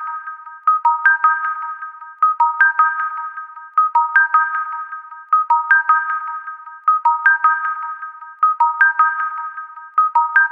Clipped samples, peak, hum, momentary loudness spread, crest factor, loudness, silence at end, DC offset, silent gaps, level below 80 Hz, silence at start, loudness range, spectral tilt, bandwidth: under 0.1%; -2 dBFS; none; 16 LU; 14 dB; -16 LUFS; 0 s; under 0.1%; none; -80 dBFS; 0 s; 0 LU; 0 dB/octave; 3.7 kHz